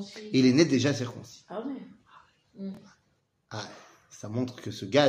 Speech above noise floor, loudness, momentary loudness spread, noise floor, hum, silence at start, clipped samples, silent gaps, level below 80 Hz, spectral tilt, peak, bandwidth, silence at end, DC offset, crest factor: 46 dB; -28 LUFS; 21 LU; -72 dBFS; none; 0 s; under 0.1%; none; -70 dBFS; -5.5 dB/octave; -6 dBFS; 9.6 kHz; 0 s; under 0.1%; 24 dB